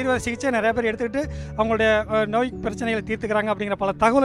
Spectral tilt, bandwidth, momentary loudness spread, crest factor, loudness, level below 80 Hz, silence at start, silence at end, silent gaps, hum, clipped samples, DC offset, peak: -5.5 dB/octave; 12.5 kHz; 7 LU; 16 dB; -23 LUFS; -42 dBFS; 0 s; 0 s; none; none; under 0.1%; under 0.1%; -6 dBFS